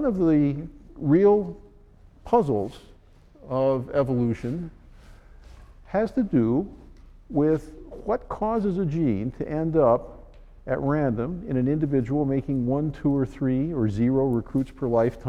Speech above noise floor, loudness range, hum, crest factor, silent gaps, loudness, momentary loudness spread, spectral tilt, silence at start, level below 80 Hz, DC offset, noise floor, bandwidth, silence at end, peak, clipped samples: 29 dB; 3 LU; none; 18 dB; none; -24 LUFS; 11 LU; -10 dB/octave; 0 s; -46 dBFS; under 0.1%; -52 dBFS; 8.6 kHz; 0 s; -8 dBFS; under 0.1%